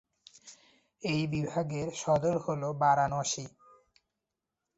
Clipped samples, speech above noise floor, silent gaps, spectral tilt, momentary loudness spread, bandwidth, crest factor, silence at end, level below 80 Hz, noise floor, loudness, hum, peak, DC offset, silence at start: under 0.1%; 57 dB; none; -5 dB/octave; 11 LU; 8.2 kHz; 20 dB; 1.3 s; -62 dBFS; -87 dBFS; -31 LUFS; none; -12 dBFS; under 0.1%; 0.45 s